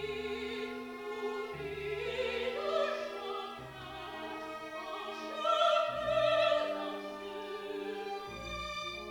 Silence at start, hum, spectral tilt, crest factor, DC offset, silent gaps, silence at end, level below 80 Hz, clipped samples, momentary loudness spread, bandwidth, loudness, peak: 0 s; none; -4 dB/octave; 18 dB; under 0.1%; none; 0 s; -60 dBFS; under 0.1%; 13 LU; 18.5 kHz; -36 LUFS; -18 dBFS